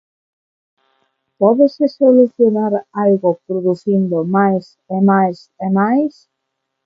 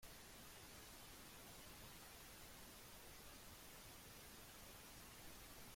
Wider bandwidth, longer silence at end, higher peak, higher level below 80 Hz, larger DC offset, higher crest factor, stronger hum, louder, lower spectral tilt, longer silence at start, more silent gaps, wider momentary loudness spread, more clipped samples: second, 6.4 kHz vs 16.5 kHz; first, 0.75 s vs 0 s; first, 0 dBFS vs -46 dBFS; about the same, -66 dBFS vs -70 dBFS; neither; about the same, 16 dB vs 14 dB; neither; first, -15 LUFS vs -59 LUFS; first, -10 dB/octave vs -2.5 dB/octave; first, 1.4 s vs 0 s; neither; first, 8 LU vs 1 LU; neither